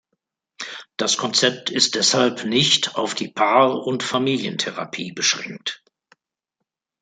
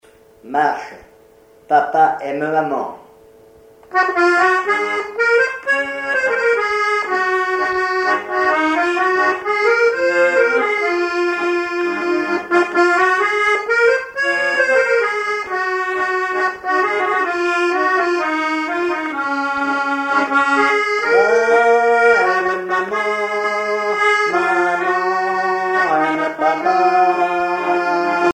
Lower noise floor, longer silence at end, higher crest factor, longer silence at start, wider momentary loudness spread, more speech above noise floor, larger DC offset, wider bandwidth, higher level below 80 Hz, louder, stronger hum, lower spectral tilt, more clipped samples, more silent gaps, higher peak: first, -81 dBFS vs -48 dBFS; first, 1.25 s vs 0 s; first, 20 dB vs 14 dB; first, 0.6 s vs 0.45 s; first, 14 LU vs 6 LU; first, 60 dB vs 31 dB; neither; about the same, 9.6 kHz vs 10.5 kHz; second, -66 dBFS vs -60 dBFS; second, -19 LUFS vs -16 LUFS; neither; about the same, -2.5 dB/octave vs -3.5 dB/octave; neither; neither; about the same, -2 dBFS vs -2 dBFS